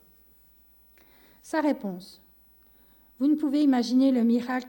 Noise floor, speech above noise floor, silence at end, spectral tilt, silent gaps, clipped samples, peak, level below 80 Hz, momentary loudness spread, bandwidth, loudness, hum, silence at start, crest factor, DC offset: -58 dBFS; 34 dB; 0 s; -5.5 dB/octave; none; under 0.1%; -12 dBFS; -68 dBFS; 10 LU; 16.5 kHz; -25 LUFS; none; 1.45 s; 16 dB; under 0.1%